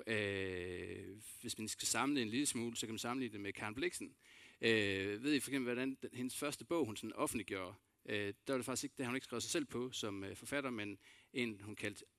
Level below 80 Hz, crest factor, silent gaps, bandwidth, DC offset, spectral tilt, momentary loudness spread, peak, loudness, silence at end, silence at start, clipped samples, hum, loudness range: -76 dBFS; 22 dB; none; 15.5 kHz; under 0.1%; -3.5 dB/octave; 11 LU; -20 dBFS; -41 LUFS; 0.15 s; 0 s; under 0.1%; none; 3 LU